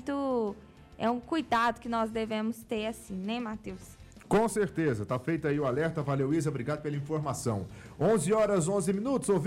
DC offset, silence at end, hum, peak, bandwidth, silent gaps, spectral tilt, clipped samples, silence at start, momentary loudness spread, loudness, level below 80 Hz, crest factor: under 0.1%; 0 s; none; -18 dBFS; 16 kHz; none; -6 dB/octave; under 0.1%; 0 s; 10 LU; -30 LUFS; -58 dBFS; 12 dB